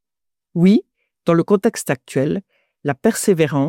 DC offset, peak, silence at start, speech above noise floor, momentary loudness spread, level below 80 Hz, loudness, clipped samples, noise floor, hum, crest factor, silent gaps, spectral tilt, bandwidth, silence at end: under 0.1%; -4 dBFS; 0.55 s; 69 dB; 11 LU; -58 dBFS; -18 LUFS; under 0.1%; -85 dBFS; none; 14 dB; none; -6 dB/octave; 16.5 kHz; 0 s